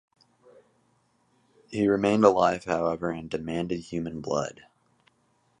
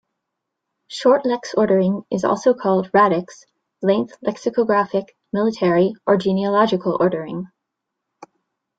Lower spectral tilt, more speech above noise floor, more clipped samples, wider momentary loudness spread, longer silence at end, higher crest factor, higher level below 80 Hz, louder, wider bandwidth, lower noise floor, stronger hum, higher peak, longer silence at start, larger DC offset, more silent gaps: about the same, -6 dB/octave vs -6.5 dB/octave; second, 43 dB vs 62 dB; neither; first, 13 LU vs 10 LU; second, 1.1 s vs 1.35 s; first, 24 dB vs 18 dB; about the same, -58 dBFS vs -62 dBFS; second, -26 LUFS vs -19 LUFS; first, 10 kHz vs 7.8 kHz; second, -69 dBFS vs -80 dBFS; neither; about the same, -4 dBFS vs -2 dBFS; first, 1.7 s vs 0.9 s; neither; neither